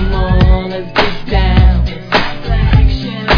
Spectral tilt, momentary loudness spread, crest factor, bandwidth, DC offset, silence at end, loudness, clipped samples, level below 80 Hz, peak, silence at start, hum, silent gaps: -7.5 dB/octave; 6 LU; 10 dB; 5.4 kHz; under 0.1%; 0 s; -13 LUFS; 0.1%; -14 dBFS; 0 dBFS; 0 s; none; none